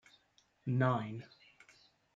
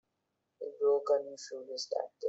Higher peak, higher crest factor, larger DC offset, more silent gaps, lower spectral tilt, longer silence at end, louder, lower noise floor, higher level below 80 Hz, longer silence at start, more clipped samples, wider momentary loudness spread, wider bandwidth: about the same, -18 dBFS vs -18 dBFS; first, 22 dB vs 16 dB; neither; neither; first, -8.5 dB/octave vs -1.5 dB/octave; first, 0.9 s vs 0 s; second, -36 LUFS vs -33 LUFS; second, -73 dBFS vs -83 dBFS; first, -80 dBFS vs -88 dBFS; about the same, 0.65 s vs 0.6 s; neither; first, 18 LU vs 15 LU; about the same, 7.4 kHz vs 8 kHz